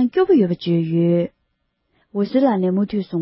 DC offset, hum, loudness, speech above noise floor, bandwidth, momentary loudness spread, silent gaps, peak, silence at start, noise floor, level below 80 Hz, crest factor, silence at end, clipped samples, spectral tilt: under 0.1%; none; -19 LUFS; 53 dB; 5.8 kHz; 8 LU; none; -4 dBFS; 0 s; -71 dBFS; -60 dBFS; 14 dB; 0 s; under 0.1%; -13 dB/octave